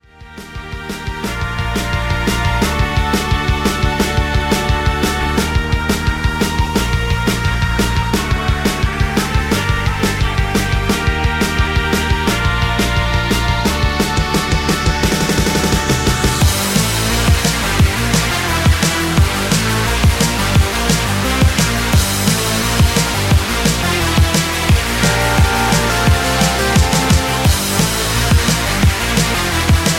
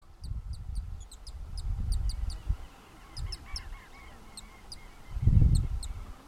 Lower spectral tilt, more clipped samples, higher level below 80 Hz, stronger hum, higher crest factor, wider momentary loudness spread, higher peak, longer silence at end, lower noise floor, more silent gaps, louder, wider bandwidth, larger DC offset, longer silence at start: second, -4 dB/octave vs -6 dB/octave; neither; first, -20 dBFS vs -34 dBFS; neither; second, 14 dB vs 22 dB; second, 4 LU vs 21 LU; first, -2 dBFS vs -10 dBFS; about the same, 0 s vs 0 s; second, -35 dBFS vs -51 dBFS; neither; first, -15 LUFS vs -33 LUFS; first, 16.5 kHz vs 13.5 kHz; neither; first, 0.2 s vs 0.05 s